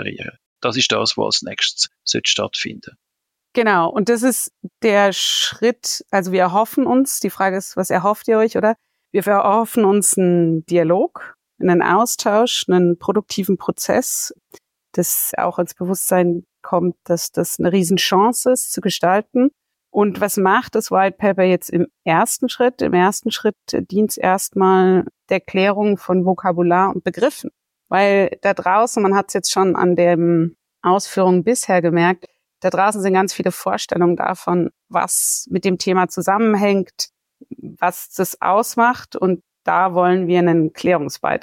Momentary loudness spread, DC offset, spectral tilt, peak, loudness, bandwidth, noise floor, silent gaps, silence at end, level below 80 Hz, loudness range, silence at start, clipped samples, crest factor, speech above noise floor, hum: 7 LU; under 0.1%; -4 dB/octave; -4 dBFS; -17 LUFS; 17 kHz; -79 dBFS; 0.46-0.56 s; 0.05 s; -62 dBFS; 3 LU; 0 s; under 0.1%; 14 dB; 62 dB; none